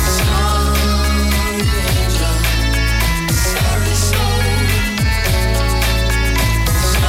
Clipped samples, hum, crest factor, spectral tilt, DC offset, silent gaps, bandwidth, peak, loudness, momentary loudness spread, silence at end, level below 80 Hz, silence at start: under 0.1%; none; 12 dB; -4 dB/octave; under 0.1%; none; 16.5 kHz; -2 dBFS; -15 LUFS; 1 LU; 0 s; -18 dBFS; 0 s